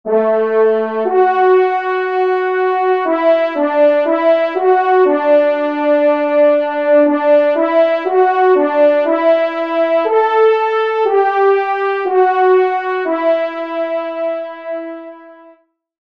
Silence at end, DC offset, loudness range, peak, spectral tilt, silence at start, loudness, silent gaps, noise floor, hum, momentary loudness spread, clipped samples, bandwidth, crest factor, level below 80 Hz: 0.75 s; 0.2%; 3 LU; -2 dBFS; -6 dB/octave; 0.05 s; -13 LUFS; none; -49 dBFS; none; 8 LU; under 0.1%; 5.6 kHz; 12 dB; -70 dBFS